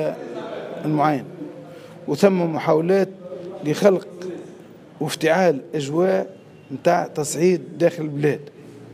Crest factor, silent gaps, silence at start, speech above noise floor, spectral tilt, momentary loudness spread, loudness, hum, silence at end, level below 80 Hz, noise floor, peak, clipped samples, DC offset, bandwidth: 20 dB; none; 0 s; 23 dB; -6 dB/octave; 17 LU; -21 LUFS; none; 0 s; -70 dBFS; -43 dBFS; -2 dBFS; under 0.1%; under 0.1%; 15.5 kHz